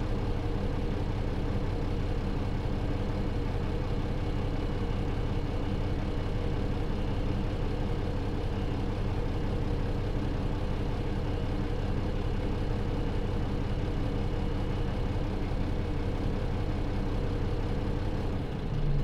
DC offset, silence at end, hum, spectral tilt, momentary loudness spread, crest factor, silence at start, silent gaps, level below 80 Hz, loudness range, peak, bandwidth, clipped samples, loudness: under 0.1%; 0 s; none; -8 dB/octave; 1 LU; 12 dB; 0 s; none; -32 dBFS; 0 LU; -16 dBFS; 7.8 kHz; under 0.1%; -33 LUFS